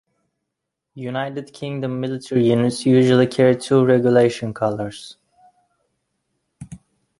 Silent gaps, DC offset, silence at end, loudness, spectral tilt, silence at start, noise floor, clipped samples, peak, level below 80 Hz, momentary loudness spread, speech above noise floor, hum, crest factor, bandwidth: none; under 0.1%; 0.45 s; -18 LUFS; -7 dB/octave; 0.95 s; -80 dBFS; under 0.1%; -2 dBFS; -58 dBFS; 15 LU; 63 dB; none; 18 dB; 11.5 kHz